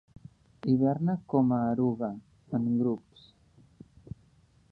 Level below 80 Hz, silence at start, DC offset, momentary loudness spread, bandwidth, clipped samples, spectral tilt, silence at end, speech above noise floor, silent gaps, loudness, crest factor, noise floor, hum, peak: -62 dBFS; 0.65 s; under 0.1%; 21 LU; 4.7 kHz; under 0.1%; -11 dB/octave; 1.75 s; 35 dB; none; -29 LUFS; 18 dB; -63 dBFS; none; -12 dBFS